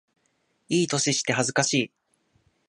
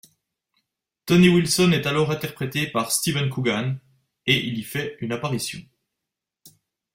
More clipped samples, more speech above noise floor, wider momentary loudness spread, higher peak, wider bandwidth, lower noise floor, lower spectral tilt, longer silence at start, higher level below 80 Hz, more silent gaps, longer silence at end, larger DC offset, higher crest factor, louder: neither; second, 47 dB vs 63 dB; second, 5 LU vs 13 LU; about the same, -6 dBFS vs -4 dBFS; second, 11.5 kHz vs 16 kHz; second, -71 dBFS vs -85 dBFS; second, -3 dB/octave vs -4.5 dB/octave; second, 0.7 s vs 1.05 s; second, -70 dBFS vs -56 dBFS; neither; first, 0.8 s vs 0.45 s; neither; about the same, 22 dB vs 20 dB; about the same, -24 LUFS vs -22 LUFS